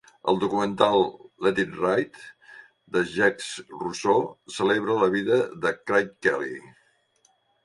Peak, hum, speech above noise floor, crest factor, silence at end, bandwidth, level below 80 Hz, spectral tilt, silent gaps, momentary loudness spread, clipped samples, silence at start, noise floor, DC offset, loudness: -4 dBFS; none; 42 dB; 22 dB; 1 s; 11.5 kHz; -64 dBFS; -5 dB/octave; none; 12 LU; under 0.1%; 0.25 s; -66 dBFS; under 0.1%; -25 LUFS